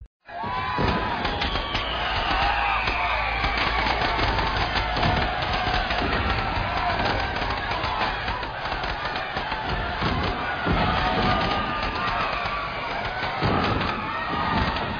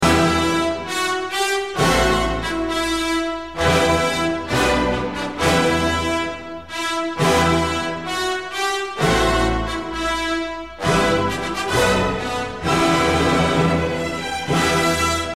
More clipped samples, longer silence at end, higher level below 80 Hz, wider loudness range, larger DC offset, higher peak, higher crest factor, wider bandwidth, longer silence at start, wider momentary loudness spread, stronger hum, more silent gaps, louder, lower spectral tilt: neither; about the same, 0 s vs 0 s; about the same, -34 dBFS vs -34 dBFS; about the same, 3 LU vs 2 LU; second, under 0.1% vs 0.5%; second, -8 dBFS vs -4 dBFS; about the same, 16 dB vs 16 dB; second, 7 kHz vs 16 kHz; about the same, 0 s vs 0 s; about the same, 5 LU vs 7 LU; neither; first, 0.07-0.20 s vs none; second, -24 LUFS vs -19 LUFS; second, -2.5 dB/octave vs -4.5 dB/octave